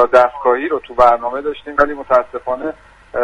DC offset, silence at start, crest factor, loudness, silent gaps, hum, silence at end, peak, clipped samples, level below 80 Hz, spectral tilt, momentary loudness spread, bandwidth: under 0.1%; 0 s; 16 dB; -16 LUFS; none; none; 0 s; 0 dBFS; under 0.1%; -42 dBFS; -5.5 dB/octave; 11 LU; 9.2 kHz